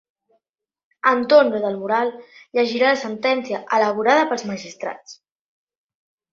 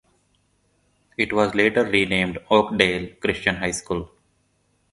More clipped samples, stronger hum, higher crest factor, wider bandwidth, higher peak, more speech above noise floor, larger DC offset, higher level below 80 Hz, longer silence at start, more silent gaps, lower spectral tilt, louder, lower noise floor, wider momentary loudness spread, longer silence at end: neither; second, none vs 50 Hz at -50 dBFS; about the same, 20 dB vs 24 dB; second, 7.6 kHz vs 11.5 kHz; about the same, -2 dBFS vs 0 dBFS; first, 57 dB vs 45 dB; neither; second, -70 dBFS vs -48 dBFS; second, 1.05 s vs 1.2 s; neither; about the same, -4 dB/octave vs -4 dB/octave; about the same, -19 LUFS vs -21 LUFS; first, -77 dBFS vs -66 dBFS; first, 15 LU vs 11 LU; first, 1.2 s vs 0.85 s